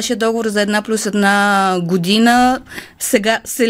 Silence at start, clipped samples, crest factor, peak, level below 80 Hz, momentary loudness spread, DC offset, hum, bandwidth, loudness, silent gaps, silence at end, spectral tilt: 0 s; under 0.1%; 14 dB; 0 dBFS; -50 dBFS; 6 LU; under 0.1%; none; 16.5 kHz; -15 LUFS; none; 0 s; -4 dB/octave